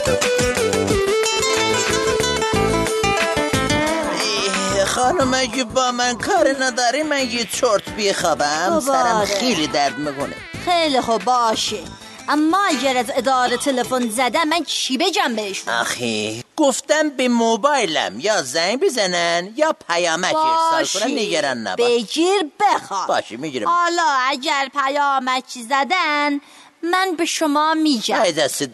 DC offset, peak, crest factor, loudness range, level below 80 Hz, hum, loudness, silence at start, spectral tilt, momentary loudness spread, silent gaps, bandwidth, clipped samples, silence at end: under 0.1%; -2 dBFS; 16 dB; 1 LU; -44 dBFS; none; -18 LUFS; 0 s; -3 dB/octave; 4 LU; none; 12.5 kHz; under 0.1%; 0 s